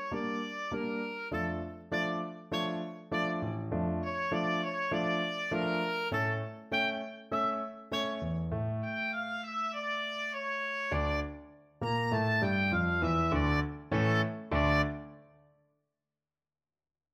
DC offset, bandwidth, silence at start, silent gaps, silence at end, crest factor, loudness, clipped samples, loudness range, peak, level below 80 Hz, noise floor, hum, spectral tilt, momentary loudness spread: under 0.1%; 15.5 kHz; 0 s; none; 1.9 s; 18 dB; -33 LUFS; under 0.1%; 4 LU; -16 dBFS; -46 dBFS; under -90 dBFS; none; -6.5 dB/octave; 7 LU